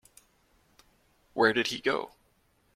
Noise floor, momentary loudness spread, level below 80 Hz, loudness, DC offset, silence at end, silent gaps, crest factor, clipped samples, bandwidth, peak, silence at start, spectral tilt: -69 dBFS; 16 LU; -68 dBFS; -28 LUFS; under 0.1%; 0.65 s; none; 24 dB; under 0.1%; 15.5 kHz; -10 dBFS; 1.35 s; -3.5 dB/octave